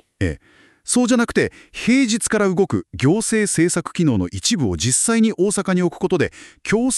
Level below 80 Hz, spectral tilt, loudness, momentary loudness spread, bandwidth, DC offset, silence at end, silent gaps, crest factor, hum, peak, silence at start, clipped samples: -44 dBFS; -4.5 dB/octave; -18 LUFS; 8 LU; 13.5 kHz; under 0.1%; 0 s; none; 16 dB; none; -4 dBFS; 0.2 s; under 0.1%